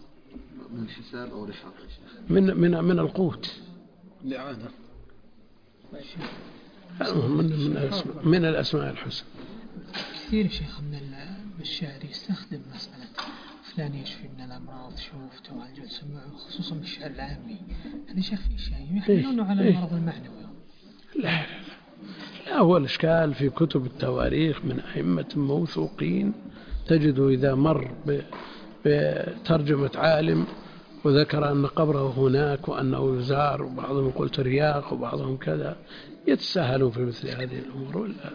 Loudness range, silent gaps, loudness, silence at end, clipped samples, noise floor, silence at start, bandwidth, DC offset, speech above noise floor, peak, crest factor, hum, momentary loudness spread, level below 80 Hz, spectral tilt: 14 LU; none; -26 LUFS; 0 s; under 0.1%; -54 dBFS; 0 s; 5.2 kHz; under 0.1%; 28 dB; -6 dBFS; 22 dB; none; 20 LU; -46 dBFS; -8 dB/octave